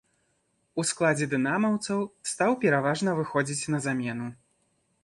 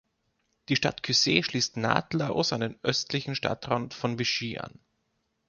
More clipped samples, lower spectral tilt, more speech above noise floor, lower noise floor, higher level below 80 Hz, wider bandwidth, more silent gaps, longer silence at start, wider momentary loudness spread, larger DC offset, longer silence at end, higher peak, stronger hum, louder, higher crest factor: neither; about the same, -5 dB/octave vs -4 dB/octave; about the same, 46 dB vs 48 dB; second, -72 dBFS vs -76 dBFS; second, -68 dBFS vs -62 dBFS; first, 11.5 kHz vs 7.4 kHz; neither; about the same, 0.75 s vs 0.7 s; about the same, 9 LU vs 7 LU; neither; about the same, 0.7 s vs 0.8 s; second, -12 dBFS vs -6 dBFS; neither; about the same, -27 LUFS vs -27 LUFS; second, 18 dB vs 24 dB